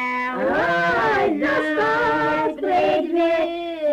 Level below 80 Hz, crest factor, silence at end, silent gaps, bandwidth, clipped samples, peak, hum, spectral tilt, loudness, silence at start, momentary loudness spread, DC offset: -52 dBFS; 8 dB; 0 s; none; 15 kHz; under 0.1%; -12 dBFS; none; -5.5 dB/octave; -20 LUFS; 0 s; 4 LU; under 0.1%